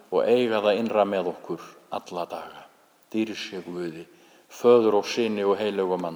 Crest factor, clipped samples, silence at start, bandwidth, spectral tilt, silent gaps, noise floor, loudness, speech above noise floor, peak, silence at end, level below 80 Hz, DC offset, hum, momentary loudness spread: 18 dB; under 0.1%; 0.1 s; over 20 kHz; -5.5 dB/octave; none; -54 dBFS; -24 LUFS; 30 dB; -6 dBFS; 0 s; -76 dBFS; under 0.1%; none; 17 LU